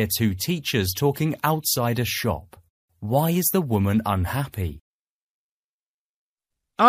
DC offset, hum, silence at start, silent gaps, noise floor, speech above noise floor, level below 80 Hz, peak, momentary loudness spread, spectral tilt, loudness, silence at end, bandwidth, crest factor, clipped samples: under 0.1%; none; 0 s; 2.70-2.88 s, 4.81-6.36 s; under -90 dBFS; over 67 dB; -48 dBFS; -2 dBFS; 9 LU; -5 dB/octave; -23 LUFS; 0 s; 15.5 kHz; 22 dB; under 0.1%